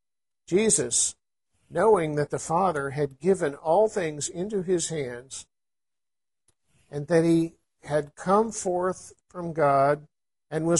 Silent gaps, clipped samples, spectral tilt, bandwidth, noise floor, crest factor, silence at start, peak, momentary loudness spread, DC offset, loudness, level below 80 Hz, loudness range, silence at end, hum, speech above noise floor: none; under 0.1%; -4.5 dB/octave; 11.5 kHz; under -90 dBFS; 18 dB; 0.5 s; -8 dBFS; 13 LU; under 0.1%; -25 LUFS; -62 dBFS; 5 LU; 0 s; none; over 65 dB